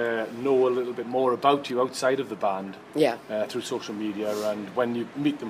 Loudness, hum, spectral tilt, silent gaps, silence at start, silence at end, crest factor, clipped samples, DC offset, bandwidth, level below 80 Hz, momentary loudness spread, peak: -27 LUFS; none; -5 dB/octave; none; 0 s; 0 s; 20 dB; under 0.1%; under 0.1%; 15.5 kHz; -72 dBFS; 8 LU; -6 dBFS